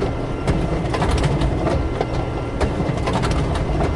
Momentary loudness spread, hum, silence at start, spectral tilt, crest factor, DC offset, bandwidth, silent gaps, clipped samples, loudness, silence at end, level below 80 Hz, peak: 4 LU; none; 0 s; -7 dB/octave; 14 dB; under 0.1%; 11.5 kHz; none; under 0.1%; -21 LUFS; 0 s; -26 dBFS; -6 dBFS